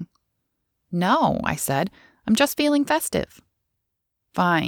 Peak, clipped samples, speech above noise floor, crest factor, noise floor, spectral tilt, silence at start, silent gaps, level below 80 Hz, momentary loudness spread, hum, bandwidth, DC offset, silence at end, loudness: -4 dBFS; under 0.1%; 57 dB; 20 dB; -79 dBFS; -4.5 dB/octave; 0 s; none; -52 dBFS; 13 LU; none; over 20 kHz; under 0.1%; 0 s; -22 LUFS